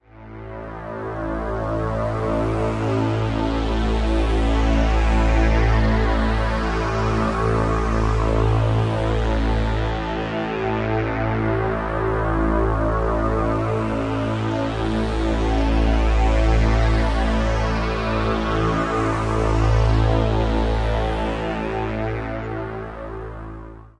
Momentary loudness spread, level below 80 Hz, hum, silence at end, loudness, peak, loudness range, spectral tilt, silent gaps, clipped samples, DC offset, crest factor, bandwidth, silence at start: 9 LU; -24 dBFS; none; 0.1 s; -21 LUFS; -4 dBFS; 3 LU; -7 dB/octave; none; under 0.1%; under 0.1%; 16 dB; 9.4 kHz; 0.15 s